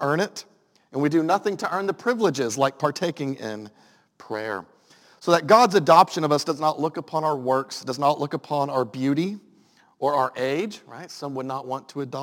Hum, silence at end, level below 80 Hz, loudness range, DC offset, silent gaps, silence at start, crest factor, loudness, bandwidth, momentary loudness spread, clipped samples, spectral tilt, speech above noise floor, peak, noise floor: none; 0 s; -76 dBFS; 7 LU; under 0.1%; none; 0 s; 22 dB; -23 LUFS; 17 kHz; 16 LU; under 0.1%; -5 dB/octave; 35 dB; -2 dBFS; -58 dBFS